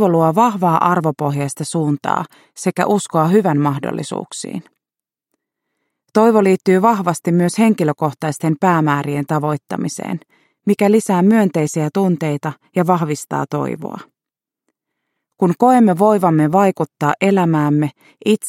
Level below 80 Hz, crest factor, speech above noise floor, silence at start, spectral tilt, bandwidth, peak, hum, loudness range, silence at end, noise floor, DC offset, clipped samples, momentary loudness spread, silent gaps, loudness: -64 dBFS; 16 dB; 72 dB; 0 s; -6.5 dB/octave; 16.5 kHz; 0 dBFS; none; 5 LU; 0 s; -87 dBFS; under 0.1%; under 0.1%; 11 LU; none; -16 LUFS